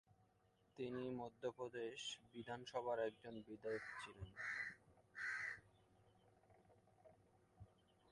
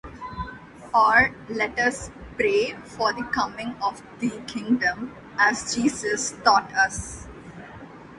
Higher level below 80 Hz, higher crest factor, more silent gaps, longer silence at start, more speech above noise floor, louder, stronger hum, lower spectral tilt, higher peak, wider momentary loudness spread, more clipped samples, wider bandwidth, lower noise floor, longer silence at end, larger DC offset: second, -76 dBFS vs -50 dBFS; about the same, 20 dB vs 22 dB; neither; first, 0.75 s vs 0.05 s; first, 29 dB vs 19 dB; second, -49 LUFS vs -23 LUFS; neither; about the same, -4 dB/octave vs -3 dB/octave; second, -32 dBFS vs -4 dBFS; about the same, 17 LU vs 19 LU; neither; about the same, 11.5 kHz vs 11.5 kHz; first, -78 dBFS vs -43 dBFS; first, 0.45 s vs 0 s; neither